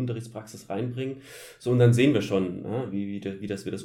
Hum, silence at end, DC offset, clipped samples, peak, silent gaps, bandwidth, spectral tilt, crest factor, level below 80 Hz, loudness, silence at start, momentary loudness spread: none; 0 s; under 0.1%; under 0.1%; -8 dBFS; none; 13.5 kHz; -7 dB/octave; 18 dB; -66 dBFS; -27 LUFS; 0 s; 18 LU